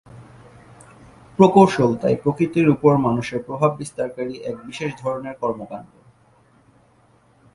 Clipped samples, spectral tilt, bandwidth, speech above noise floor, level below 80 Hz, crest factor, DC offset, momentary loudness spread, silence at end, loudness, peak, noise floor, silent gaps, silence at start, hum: under 0.1%; -7.5 dB/octave; 11.5 kHz; 37 dB; -56 dBFS; 20 dB; under 0.1%; 17 LU; 1.7 s; -20 LUFS; 0 dBFS; -56 dBFS; none; 0.15 s; none